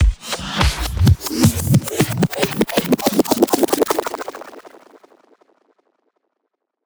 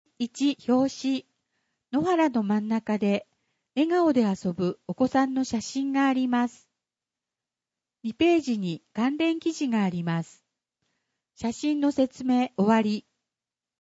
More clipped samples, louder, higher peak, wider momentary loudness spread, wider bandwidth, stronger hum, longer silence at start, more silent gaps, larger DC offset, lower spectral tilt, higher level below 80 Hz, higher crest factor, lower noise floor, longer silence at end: neither; first, -18 LUFS vs -26 LUFS; first, 0 dBFS vs -10 dBFS; about the same, 11 LU vs 9 LU; first, over 20 kHz vs 8 kHz; neither; second, 0 s vs 0.2 s; neither; neither; about the same, -5 dB/octave vs -6 dB/octave; first, -28 dBFS vs -66 dBFS; about the same, 18 dB vs 18 dB; second, -75 dBFS vs under -90 dBFS; first, 2.15 s vs 0.9 s